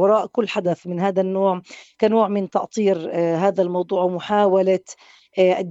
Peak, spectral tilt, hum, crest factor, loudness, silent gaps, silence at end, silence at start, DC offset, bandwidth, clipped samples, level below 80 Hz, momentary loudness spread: -4 dBFS; -6.5 dB/octave; none; 16 dB; -20 LUFS; none; 0 s; 0 s; under 0.1%; 8 kHz; under 0.1%; -68 dBFS; 6 LU